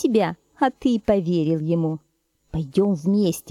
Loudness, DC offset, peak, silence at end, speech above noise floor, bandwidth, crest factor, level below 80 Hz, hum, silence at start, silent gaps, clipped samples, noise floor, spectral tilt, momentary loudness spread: -22 LUFS; under 0.1%; -6 dBFS; 0 s; 21 dB; 15.5 kHz; 16 dB; -50 dBFS; none; 0 s; none; under 0.1%; -41 dBFS; -7 dB/octave; 7 LU